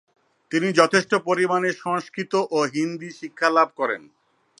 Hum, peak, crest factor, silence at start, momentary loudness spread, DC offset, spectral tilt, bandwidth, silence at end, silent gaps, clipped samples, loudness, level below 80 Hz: none; 0 dBFS; 22 dB; 0.5 s; 9 LU; under 0.1%; -4.5 dB/octave; 11 kHz; 0.6 s; none; under 0.1%; -22 LUFS; -72 dBFS